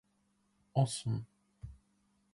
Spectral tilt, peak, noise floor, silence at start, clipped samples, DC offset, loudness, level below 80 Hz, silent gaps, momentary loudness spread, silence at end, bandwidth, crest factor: -6 dB/octave; -18 dBFS; -76 dBFS; 0.75 s; under 0.1%; under 0.1%; -36 LUFS; -62 dBFS; none; 21 LU; 0.6 s; 11.5 kHz; 22 dB